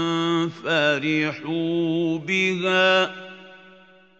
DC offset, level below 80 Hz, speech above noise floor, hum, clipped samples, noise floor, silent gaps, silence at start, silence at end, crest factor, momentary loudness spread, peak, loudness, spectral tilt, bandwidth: under 0.1%; -74 dBFS; 29 dB; none; under 0.1%; -51 dBFS; none; 0 s; 0.65 s; 16 dB; 8 LU; -6 dBFS; -22 LUFS; -5 dB/octave; 8 kHz